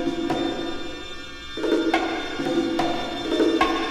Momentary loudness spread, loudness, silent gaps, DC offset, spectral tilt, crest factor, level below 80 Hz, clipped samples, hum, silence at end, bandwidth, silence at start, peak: 13 LU; -24 LUFS; none; under 0.1%; -4.5 dB/octave; 18 dB; -44 dBFS; under 0.1%; none; 0 s; 13.5 kHz; 0 s; -6 dBFS